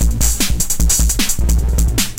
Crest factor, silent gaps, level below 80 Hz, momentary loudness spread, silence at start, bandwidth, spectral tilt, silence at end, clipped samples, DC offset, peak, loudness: 12 dB; none; -16 dBFS; 3 LU; 0 s; 17.5 kHz; -3 dB/octave; 0 s; under 0.1%; under 0.1%; -2 dBFS; -15 LUFS